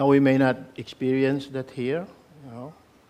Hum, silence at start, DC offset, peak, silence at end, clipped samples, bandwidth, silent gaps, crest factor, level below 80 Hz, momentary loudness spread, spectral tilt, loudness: none; 0 s; under 0.1%; -8 dBFS; 0.4 s; under 0.1%; 9 kHz; none; 18 dB; -64 dBFS; 23 LU; -8 dB/octave; -24 LUFS